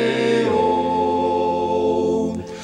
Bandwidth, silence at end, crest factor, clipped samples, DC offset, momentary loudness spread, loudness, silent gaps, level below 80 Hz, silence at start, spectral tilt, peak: 9.8 kHz; 0 s; 12 dB; under 0.1%; under 0.1%; 3 LU; -19 LUFS; none; -50 dBFS; 0 s; -6 dB/octave; -6 dBFS